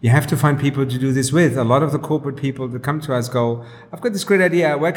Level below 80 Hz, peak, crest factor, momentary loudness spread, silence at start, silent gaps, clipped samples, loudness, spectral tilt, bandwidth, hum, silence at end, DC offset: -54 dBFS; -2 dBFS; 16 dB; 9 LU; 0 s; none; under 0.1%; -18 LUFS; -6 dB/octave; 18.5 kHz; none; 0 s; under 0.1%